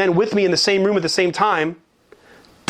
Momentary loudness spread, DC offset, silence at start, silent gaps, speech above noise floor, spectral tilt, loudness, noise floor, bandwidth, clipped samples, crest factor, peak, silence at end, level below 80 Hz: 4 LU; under 0.1%; 0 s; none; 32 dB; -4 dB/octave; -18 LUFS; -50 dBFS; 13 kHz; under 0.1%; 16 dB; -4 dBFS; 0.95 s; -60 dBFS